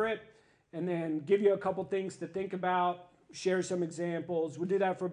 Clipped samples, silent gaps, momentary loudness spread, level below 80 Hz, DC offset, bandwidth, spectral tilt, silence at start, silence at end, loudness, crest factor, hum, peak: under 0.1%; none; 10 LU; -74 dBFS; under 0.1%; 10.5 kHz; -6 dB/octave; 0 s; 0 s; -33 LUFS; 18 dB; none; -16 dBFS